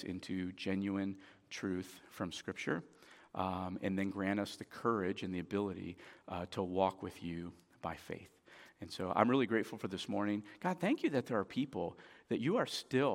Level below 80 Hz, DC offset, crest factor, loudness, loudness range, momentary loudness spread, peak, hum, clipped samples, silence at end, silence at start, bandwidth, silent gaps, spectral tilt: -72 dBFS; under 0.1%; 26 dB; -38 LUFS; 5 LU; 15 LU; -12 dBFS; none; under 0.1%; 0 s; 0 s; 16.5 kHz; none; -6 dB/octave